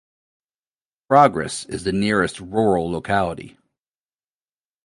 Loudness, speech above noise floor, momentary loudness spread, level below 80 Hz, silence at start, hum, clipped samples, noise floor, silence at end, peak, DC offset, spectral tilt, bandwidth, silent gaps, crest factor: -20 LUFS; over 71 dB; 12 LU; -48 dBFS; 1.1 s; none; under 0.1%; under -90 dBFS; 1.35 s; 0 dBFS; under 0.1%; -5.5 dB/octave; 11.5 kHz; none; 22 dB